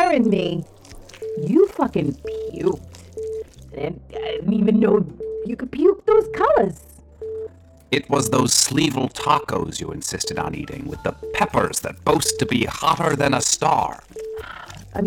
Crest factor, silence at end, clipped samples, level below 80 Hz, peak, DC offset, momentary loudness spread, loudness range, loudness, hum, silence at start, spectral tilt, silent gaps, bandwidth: 16 dB; 0 s; under 0.1%; -46 dBFS; -6 dBFS; under 0.1%; 16 LU; 4 LU; -21 LUFS; none; 0 s; -4 dB/octave; none; 19.5 kHz